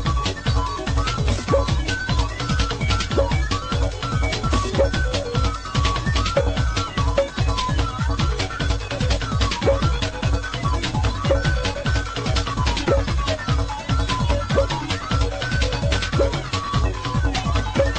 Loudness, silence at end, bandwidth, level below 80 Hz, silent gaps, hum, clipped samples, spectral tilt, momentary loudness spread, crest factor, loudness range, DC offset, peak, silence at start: -22 LUFS; 0 s; 9.4 kHz; -26 dBFS; none; none; under 0.1%; -5 dB/octave; 3 LU; 16 dB; 1 LU; under 0.1%; -6 dBFS; 0 s